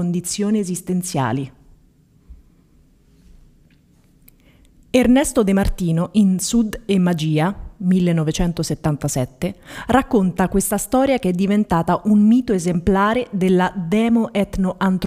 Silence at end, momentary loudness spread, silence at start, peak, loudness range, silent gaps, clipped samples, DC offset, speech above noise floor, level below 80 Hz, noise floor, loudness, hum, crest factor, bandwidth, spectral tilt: 0 s; 8 LU; 0 s; 0 dBFS; 8 LU; none; under 0.1%; under 0.1%; 36 dB; -36 dBFS; -54 dBFS; -18 LUFS; none; 18 dB; 16 kHz; -6 dB/octave